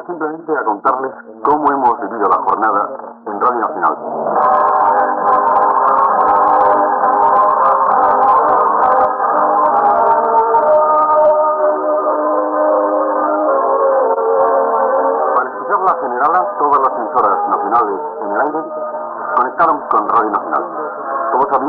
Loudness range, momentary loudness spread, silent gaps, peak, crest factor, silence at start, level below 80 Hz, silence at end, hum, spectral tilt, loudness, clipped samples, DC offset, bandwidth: 4 LU; 8 LU; none; -2 dBFS; 10 dB; 0 s; -56 dBFS; 0 s; none; -5 dB/octave; -13 LUFS; under 0.1%; under 0.1%; 4.7 kHz